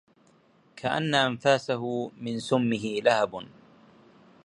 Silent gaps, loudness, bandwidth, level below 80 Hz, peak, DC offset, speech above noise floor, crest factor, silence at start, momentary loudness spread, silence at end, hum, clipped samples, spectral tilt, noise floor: none; -27 LUFS; 11.5 kHz; -68 dBFS; -6 dBFS; under 0.1%; 35 dB; 22 dB; 0.75 s; 10 LU; 1 s; none; under 0.1%; -5 dB/octave; -61 dBFS